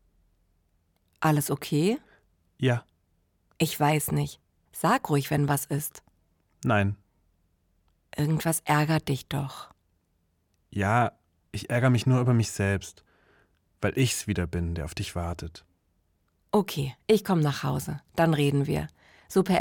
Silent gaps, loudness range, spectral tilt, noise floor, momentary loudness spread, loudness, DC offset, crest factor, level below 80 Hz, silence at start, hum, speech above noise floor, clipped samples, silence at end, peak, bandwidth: none; 3 LU; -5.5 dB/octave; -72 dBFS; 12 LU; -27 LUFS; under 0.1%; 18 dB; -54 dBFS; 1.2 s; none; 46 dB; under 0.1%; 0 s; -10 dBFS; 18 kHz